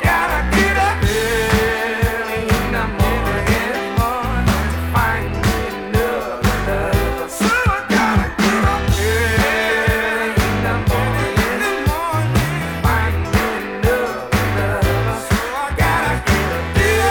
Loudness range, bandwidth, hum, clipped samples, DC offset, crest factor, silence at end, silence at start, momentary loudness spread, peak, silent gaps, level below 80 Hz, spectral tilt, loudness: 2 LU; 19 kHz; none; under 0.1%; under 0.1%; 16 dB; 0 s; 0 s; 4 LU; -2 dBFS; none; -26 dBFS; -5 dB/octave; -17 LUFS